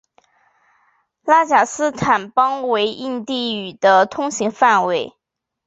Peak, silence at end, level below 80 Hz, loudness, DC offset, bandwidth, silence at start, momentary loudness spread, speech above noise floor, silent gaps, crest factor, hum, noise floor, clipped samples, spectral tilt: -2 dBFS; 0.55 s; -60 dBFS; -17 LUFS; under 0.1%; 8.2 kHz; 1.25 s; 10 LU; 64 dB; none; 18 dB; none; -81 dBFS; under 0.1%; -3.5 dB/octave